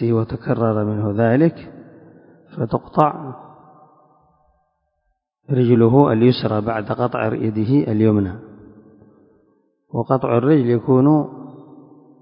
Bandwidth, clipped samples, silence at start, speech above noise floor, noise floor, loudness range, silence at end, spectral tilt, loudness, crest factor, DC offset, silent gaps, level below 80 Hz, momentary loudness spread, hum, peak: 5.4 kHz; under 0.1%; 0 s; 54 dB; -71 dBFS; 9 LU; 0.6 s; -11.5 dB/octave; -18 LUFS; 20 dB; under 0.1%; none; -50 dBFS; 18 LU; none; 0 dBFS